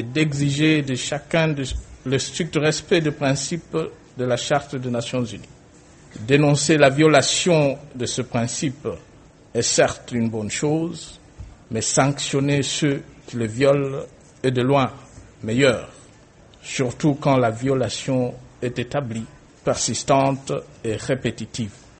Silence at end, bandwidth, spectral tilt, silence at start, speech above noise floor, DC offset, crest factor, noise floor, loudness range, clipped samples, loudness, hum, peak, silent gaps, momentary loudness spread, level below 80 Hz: 0.25 s; 8.8 kHz; -4.5 dB/octave; 0 s; 28 dB; under 0.1%; 22 dB; -49 dBFS; 5 LU; under 0.1%; -21 LUFS; none; 0 dBFS; none; 13 LU; -48 dBFS